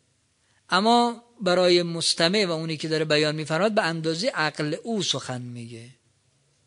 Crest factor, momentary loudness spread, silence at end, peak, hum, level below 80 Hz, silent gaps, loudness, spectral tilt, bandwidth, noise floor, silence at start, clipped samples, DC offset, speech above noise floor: 20 dB; 13 LU; 0.75 s; -6 dBFS; none; -72 dBFS; none; -23 LUFS; -4 dB/octave; 10.5 kHz; -67 dBFS; 0.7 s; under 0.1%; under 0.1%; 43 dB